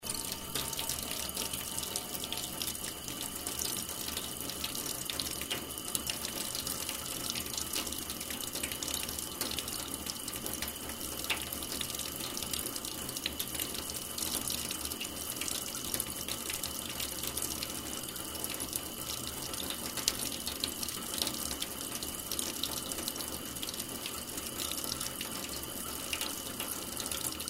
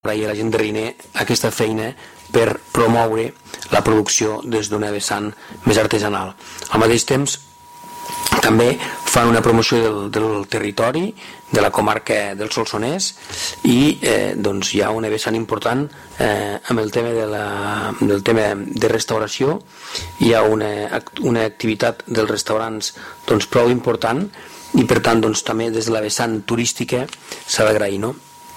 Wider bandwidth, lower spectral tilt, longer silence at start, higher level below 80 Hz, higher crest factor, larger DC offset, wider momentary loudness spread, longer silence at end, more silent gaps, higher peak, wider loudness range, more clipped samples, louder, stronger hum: about the same, 16 kHz vs 16.5 kHz; second, -1.5 dB/octave vs -4 dB/octave; about the same, 0 s vs 0.05 s; second, -56 dBFS vs -46 dBFS; first, 32 dB vs 14 dB; neither; second, 4 LU vs 10 LU; about the same, 0 s vs 0 s; neither; about the same, -6 dBFS vs -4 dBFS; about the same, 1 LU vs 3 LU; neither; second, -35 LUFS vs -18 LUFS; neither